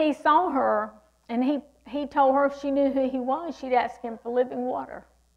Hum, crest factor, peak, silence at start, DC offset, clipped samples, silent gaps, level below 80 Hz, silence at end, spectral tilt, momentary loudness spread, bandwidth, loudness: none; 16 dB; -10 dBFS; 0 s; under 0.1%; under 0.1%; none; -62 dBFS; 0.35 s; -5.5 dB/octave; 13 LU; 9.4 kHz; -25 LUFS